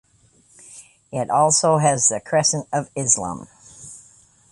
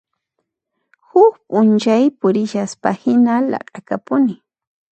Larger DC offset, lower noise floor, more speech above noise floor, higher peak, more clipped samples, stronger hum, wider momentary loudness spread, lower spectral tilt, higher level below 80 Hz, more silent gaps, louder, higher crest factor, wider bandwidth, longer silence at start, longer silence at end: neither; second, -57 dBFS vs -75 dBFS; second, 37 dB vs 60 dB; about the same, -2 dBFS vs 0 dBFS; neither; neither; first, 23 LU vs 11 LU; second, -3 dB/octave vs -6.5 dB/octave; first, -58 dBFS vs -66 dBFS; neither; second, -19 LUFS vs -16 LUFS; about the same, 20 dB vs 16 dB; first, 11.5 kHz vs 8.6 kHz; second, 0.7 s vs 1.15 s; about the same, 0.55 s vs 0.6 s